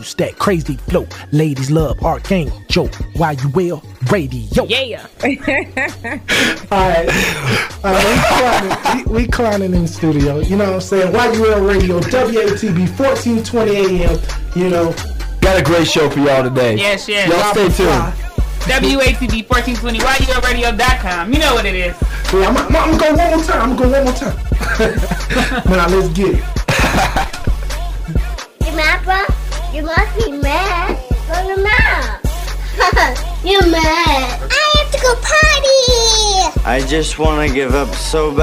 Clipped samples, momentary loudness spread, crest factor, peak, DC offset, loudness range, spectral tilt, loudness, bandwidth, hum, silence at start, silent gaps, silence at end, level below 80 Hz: under 0.1%; 9 LU; 14 dB; 0 dBFS; under 0.1%; 5 LU; -4.5 dB/octave; -14 LUFS; 16 kHz; none; 0 s; none; 0 s; -20 dBFS